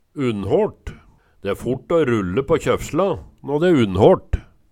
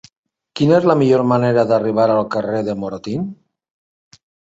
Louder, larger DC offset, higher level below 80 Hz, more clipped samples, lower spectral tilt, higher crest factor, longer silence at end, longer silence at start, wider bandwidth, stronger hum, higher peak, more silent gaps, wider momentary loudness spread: second, -19 LUFS vs -16 LUFS; neither; first, -38 dBFS vs -56 dBFS; neither; about the same, -7 dB/octave vs -8 dB/octave; about the same, 20 dB vs 16 dB; second, 0.3 s vs 1.15 s; second, 0.15 s vs 0.55 s; first, 15.5 kHz vs 8 kHz; neither; about the same, 0 dBFS vs -2 dBFS; neither; first, 15 LU vs 12 LU